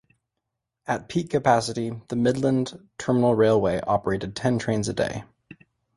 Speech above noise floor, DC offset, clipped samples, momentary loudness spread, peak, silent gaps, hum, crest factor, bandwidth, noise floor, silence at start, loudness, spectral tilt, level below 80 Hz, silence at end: 59 dB; under 0.1%; under 0.1%; 11 LU; -4 dBFS; none; none; 20 dB; 11.5 kHz; -82 dBFS; 0.9 s; -24 LUFS; -6 dB/octave; -52 dBFS; 0.45 s